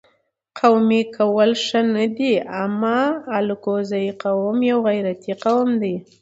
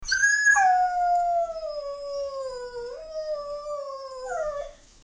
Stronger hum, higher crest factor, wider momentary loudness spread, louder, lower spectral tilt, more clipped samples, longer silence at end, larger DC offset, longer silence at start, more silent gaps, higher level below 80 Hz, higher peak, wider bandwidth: neither; about the same, 16 dB vs 16 dB; second, 7 LU vs 18 LU; first, -19 LUFS vs -25 LUFS; first, -6 dB/octave vs 1 dB/octave; neither; about the same, 0.2 s vs 0.3 s; neither; first, 0.55 s vs 0 s; neither; second, -68 dBFS vs -52 dBFS; first, -2 dBFS vs -10 dBFS; second, 8 kHz vs 10 kHz